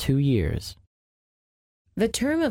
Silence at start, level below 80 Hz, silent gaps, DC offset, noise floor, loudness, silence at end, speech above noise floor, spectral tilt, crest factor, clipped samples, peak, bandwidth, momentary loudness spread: 0 s; -42 dBFS; 0.87-1.85 s; under 0.1%; under -90 dBFS; -25 LUFS; 0 s; over 67 dB; -6 dB/octave; 16 dB; under 0.1%; -10 dBFS; 16.5 kHz; 16 LU